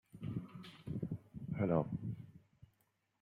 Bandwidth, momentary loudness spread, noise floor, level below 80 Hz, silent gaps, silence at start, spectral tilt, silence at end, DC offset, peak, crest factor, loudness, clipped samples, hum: 9.8 kHz; 16 LU; -80 dBFS; -68 dBFS; none; 0.15 s; -9.5 dB/octave; 0.55 s; under 0.1%; -18 dBFS; 24 dB; -42 LUFS; under 0.1%; none